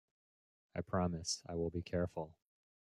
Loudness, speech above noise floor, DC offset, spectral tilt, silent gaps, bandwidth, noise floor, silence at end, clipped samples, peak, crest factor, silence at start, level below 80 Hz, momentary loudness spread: -40 LUFS; over 51 dB; under 0.1%; -5 dB/octave; none; 12 kHz; under -90 dBFS; 0.5 s; under 0.1%; -24 dBFS; 18 dB; 0.75 s; -64 dBFS; 10 LU